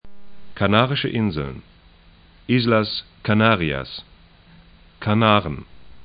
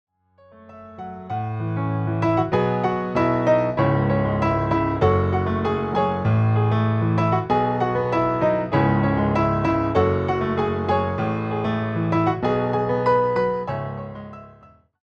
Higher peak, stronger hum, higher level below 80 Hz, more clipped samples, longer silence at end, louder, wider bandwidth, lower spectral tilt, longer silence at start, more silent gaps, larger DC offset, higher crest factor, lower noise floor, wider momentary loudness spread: first, 0 dBFS vs -6 dBFS; neither; about the same, -46 dBFS vs -44 dBFS; neither; second, 0 s vs 0.55 s; about the same, -20 LUFS vs -21 LUFS; second, 5.2 kHz vs 6.6 kHz; about the same, -9.5 dB/octave vs -9 dB/octave; second, 0.05 s vs 0.65 s; neither; neither; first, 22 dB vs 16 dB; about the same, -50 dBFS vs -53 dBFS; first, 17 LU vs 8 LU